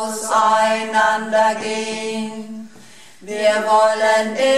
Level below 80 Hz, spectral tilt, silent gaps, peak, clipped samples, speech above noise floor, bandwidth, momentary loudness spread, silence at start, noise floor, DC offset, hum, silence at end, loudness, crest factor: -64 dBFS; -2.5 dB/octave; none; -4 dBFS; under 0.1%; 28 dB; 13.5 kHz; 14 LU; 0 s; -45 dBFS; 0.6%; none; 0 s; -17 LUFS; 14 dB